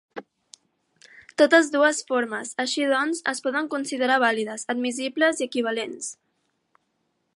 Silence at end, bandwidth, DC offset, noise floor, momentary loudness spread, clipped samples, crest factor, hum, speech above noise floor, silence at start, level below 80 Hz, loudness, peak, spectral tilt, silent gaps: 1.25 s; 11.5 kHz; under 0.1%; -74 dBFS; 14 LU; under 0.1%; 22 dB; none; 50 dB; 0.15 s; -80 dBFS; -23 LUFS; -4 dBFS; -2 dB/octave; none